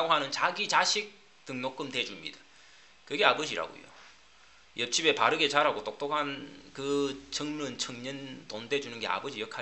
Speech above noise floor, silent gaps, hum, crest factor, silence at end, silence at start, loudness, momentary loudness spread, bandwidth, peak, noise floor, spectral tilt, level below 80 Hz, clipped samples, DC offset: 28 dB; none; none; 26 dB; 0 s; 0 s; -30 LUFS; 17 LU; 8.4 kHz; -4 dBFS; -59 dBFS; -2 dB/octave; -70 dBFS; under 0.1%; under 0.1%